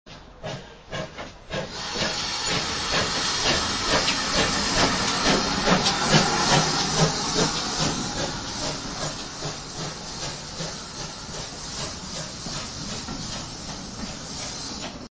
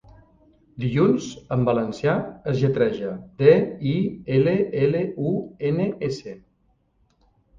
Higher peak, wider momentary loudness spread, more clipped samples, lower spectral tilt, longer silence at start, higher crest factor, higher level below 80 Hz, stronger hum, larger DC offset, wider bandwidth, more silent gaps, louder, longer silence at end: about the same, -4 dBFS vs -2 dBFS; first, 14 LU vs 10 LU; neither; second, -2.5 dB/octave vs -8 dB/octave; second, 0.05 s vs 0.75 s; about the same, 22 dB vs 20 dB; first, -44 dBFS vs -54 dBFS; neither; neither; about the same, 8 kHz vs 7.6 kHz; neither; about the same, -24 LUFS vs -22 LUFS; second, 0.05 s vs 1.2 s